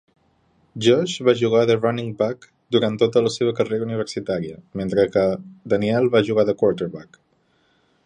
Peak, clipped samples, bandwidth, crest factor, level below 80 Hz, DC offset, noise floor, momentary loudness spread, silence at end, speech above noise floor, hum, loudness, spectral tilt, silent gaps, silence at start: -2 dBFS; under 0.1%; 9.8 kHz; 18 dB; -56 dBFS; under 0.1%; -63 dBFS; 11 LU; 1.05 s; 43 dB; none; -21 LUFS; -6 dB/octave; none; 0.75 s